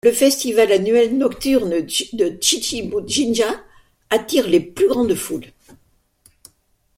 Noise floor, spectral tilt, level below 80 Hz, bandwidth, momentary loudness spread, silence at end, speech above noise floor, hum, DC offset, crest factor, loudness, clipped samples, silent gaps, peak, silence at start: -61 dBFS; -3 dB/octave; -50 dBFS; 16.5 kHz; 7 LU; 1.5 s; 44 dB; none; under 0.1%; 18 dB; -18 LUFS; under 0.1%; none; -2 dBFS; 0.05 s